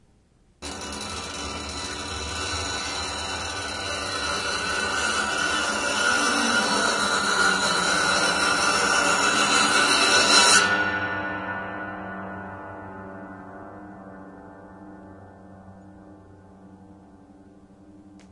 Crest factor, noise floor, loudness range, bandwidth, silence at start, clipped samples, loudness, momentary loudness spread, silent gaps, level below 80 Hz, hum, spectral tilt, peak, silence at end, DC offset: 22 dB; -60 dBFS; 20 LU; 11.5 kHz; 0.6 s; under 0.1%; -22 LUFS; 22 LU; none; -52 dBFS; none; -1 dB/octave; -4 dBFS; 0.05 s; under 0.1%